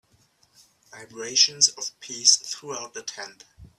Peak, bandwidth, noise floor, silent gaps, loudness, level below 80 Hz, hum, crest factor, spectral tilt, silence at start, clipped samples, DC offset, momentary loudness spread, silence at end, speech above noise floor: -2 dBFS; 14.5 kHz; -63 dBFS; none; -20 LUFS; -64 dBFS; none; 26 dB; 1.5 dB/octave; 0.95 s; under 0.1%; under 0.1%; 20 LU; 0.1 s; 38 dB